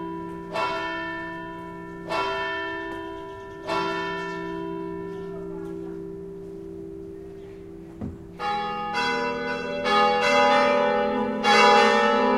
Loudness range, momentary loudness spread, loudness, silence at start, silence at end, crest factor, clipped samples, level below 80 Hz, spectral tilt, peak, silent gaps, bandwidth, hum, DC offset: 15 LU; 20 LU; -24 LUFS; 0 s; 0 s; 20 dB; under 0.1%; -54 dBFS; -4 dB/octave; -4 dBFS; none; 13 kHz; none; under 0.1%